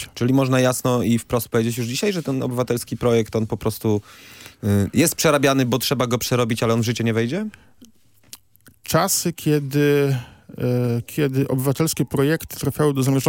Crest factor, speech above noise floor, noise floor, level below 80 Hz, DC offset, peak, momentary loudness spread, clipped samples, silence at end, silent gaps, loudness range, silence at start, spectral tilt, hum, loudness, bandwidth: 16 dB; 33 dB; -53 dBFS; -52 dBFS; under 0.1%; -4 dBFS; 7 LU; under 0.1%; 0 s; none; 3 LU; 0 s; -5 dB/octave; none; -20 LUFS; 17 kHz